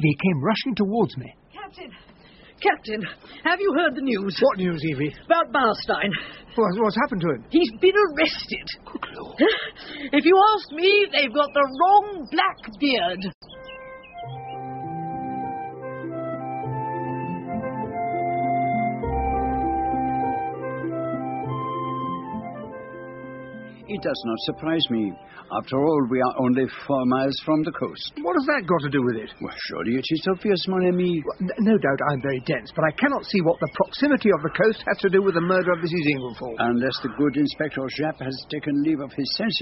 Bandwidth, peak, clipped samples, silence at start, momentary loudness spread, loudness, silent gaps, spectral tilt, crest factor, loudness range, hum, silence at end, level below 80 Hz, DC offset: 6 kHz; -4 dBFS; under 0.1%; 0 s; 14 LU; -23 LUFS; 13.35-13.41 s; -4 dB/octave; 18 dB; 9 LU; none; 0 s; -48 dBFS; under 0.1%